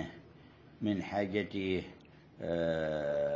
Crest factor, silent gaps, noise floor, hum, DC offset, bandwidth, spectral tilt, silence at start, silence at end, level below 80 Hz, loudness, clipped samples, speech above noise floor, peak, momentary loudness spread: 16 dB; none; -57 dBFS; none; under 0.1%; 7.6 kHz; -7 dB/octave; 0 s; 0 s; -58 dBFS; -35 LUFS; under 0.1%; 23 dB; -18 dBFS; 12 LU